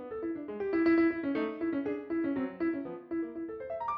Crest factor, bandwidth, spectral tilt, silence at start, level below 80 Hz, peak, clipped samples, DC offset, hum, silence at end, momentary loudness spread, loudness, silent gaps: 14 dB; 5.2 kHz; -8.5 dB/octave; 0 s; -66 dBFS; -18 dBFS; under 0.1%; under 0.1%; none; 0 s; 11 LU; -33 LUFS; none